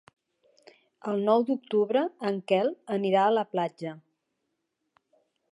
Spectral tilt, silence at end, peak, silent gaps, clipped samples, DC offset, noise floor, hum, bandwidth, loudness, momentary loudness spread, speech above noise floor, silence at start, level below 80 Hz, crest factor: -7 dB/octave; 1.55 s; -10 dBFS; none; under 0.1%; under 0.1%; -80 dBFS; none; 10.5 kHz; -27 LUFS; 9 LU; 54 dB; 1.05 s; -84 dBFS; 18 dB